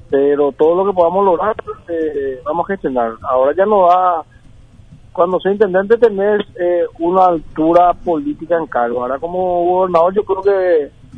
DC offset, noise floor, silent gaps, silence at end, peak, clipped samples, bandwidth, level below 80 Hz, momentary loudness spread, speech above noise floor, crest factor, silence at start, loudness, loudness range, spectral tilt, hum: under 0.1%; -41 dBFS; none; 0 s; 0 dBFS; under 0.1%; 6 kHz; -44 dBFS; 8 LU; 27 dB; 14 dB; 0.1 s; -15 LUFS; 2 LU; -8.5 dB/octave; none